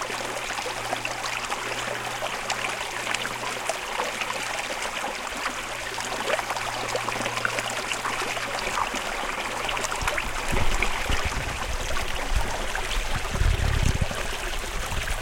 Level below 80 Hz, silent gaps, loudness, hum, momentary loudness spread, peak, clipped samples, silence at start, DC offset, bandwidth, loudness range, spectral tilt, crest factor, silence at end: -34 dBFS; none; -28 LUFS; none; 3 LU; -4 dBFS; under 0.1%; 0 s; under 0.1%; 17 kHz; 1 LU; -3 dB/octave; 24 dB; 0 s